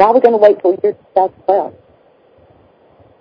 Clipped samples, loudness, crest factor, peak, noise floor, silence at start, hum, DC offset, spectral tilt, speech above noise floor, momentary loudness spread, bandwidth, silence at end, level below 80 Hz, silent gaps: 0.3%; -13 LUFS; 14 dB; 0 dBFS; -49 dBFS; 0 s; none; under 0.1%; -7.5 dB/octave; 37 dB; 8 LU; 6 kHz; 1.5 s; -58 dBFS; none